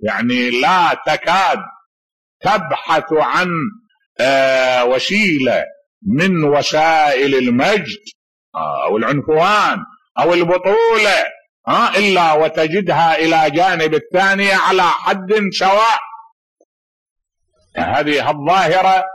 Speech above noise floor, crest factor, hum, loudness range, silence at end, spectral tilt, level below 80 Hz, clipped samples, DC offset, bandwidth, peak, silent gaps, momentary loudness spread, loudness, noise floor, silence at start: 48 dB; 10 dB; none; 4 LU; 0 s; -4.5 dB/octave; -54 dBFS; under 0.1%; 0.2%; 12 kHz; -4 dBFS; 1.86-2.40 s, 4.06-4.16 s, 5.86-6.01 s, 8.15-8.52 s, 10.11-10.15 s, 11.49-11.64 s, 16.32-16.56 s, 16.65-17.16 s; 10 LU; -14 LUFS; -62 dBFS; 0 s